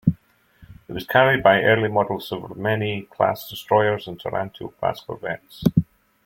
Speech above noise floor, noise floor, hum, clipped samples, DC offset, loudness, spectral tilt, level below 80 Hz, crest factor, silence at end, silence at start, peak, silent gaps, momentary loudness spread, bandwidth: 32 dB; -53 dBFS; none; under 0.1%; under 0.1%; -21 LUFS; -7 dB/octave; -52 dBFS; 20 dB; 0.4 s; 0.05 s; -2 dBFS; none; 16 LU; 16.5 kHz